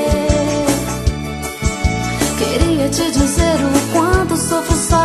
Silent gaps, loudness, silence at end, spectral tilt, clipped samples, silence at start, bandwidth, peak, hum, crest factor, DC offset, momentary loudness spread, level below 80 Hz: none; -16 LUFS; 0 s; -4.5 dB/octave; under 0.1%; 0 s; 13 kHz; 0 dBFS; none; 14 dB; 0.1%; 6 LU; -24 dBFS